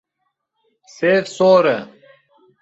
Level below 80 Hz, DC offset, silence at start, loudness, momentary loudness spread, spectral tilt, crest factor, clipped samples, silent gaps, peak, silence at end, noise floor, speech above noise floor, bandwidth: -64 dBFS; under 0.1%; 1 s; -16 LUFS; 8 LU; -5.5 dB/octave; 16 dB; under 0.1%; none; -2 dBFS; 0.75 s; -74 dBFS; 58 dB; 8 kHz